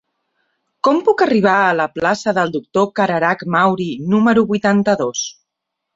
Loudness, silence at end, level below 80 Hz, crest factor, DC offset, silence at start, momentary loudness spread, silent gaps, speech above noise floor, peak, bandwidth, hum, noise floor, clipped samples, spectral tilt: -16 LUFS; 0.65 s; -58 dBFS; 16 dB; under 0.1%; 0.85 s; 6 LU; none; 63 dB; -2 dBFS; 7.8 kHz; none; -79 dBFS; under 0.1%; -5 dB/octave